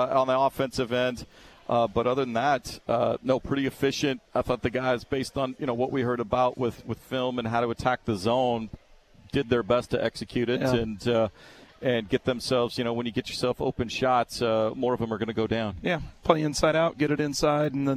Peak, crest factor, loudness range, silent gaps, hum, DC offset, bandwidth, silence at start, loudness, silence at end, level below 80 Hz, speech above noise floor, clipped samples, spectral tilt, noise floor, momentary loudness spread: -4 dBFS; 22 dB; 2 LU; none; none; under 0.1%; 14 kHz; 0 s; -27 LUFS; 0 s; -50 dBFS; 28 dB; under 0.1%; -5.5 dB/octave; -54 dBFS; 6 LU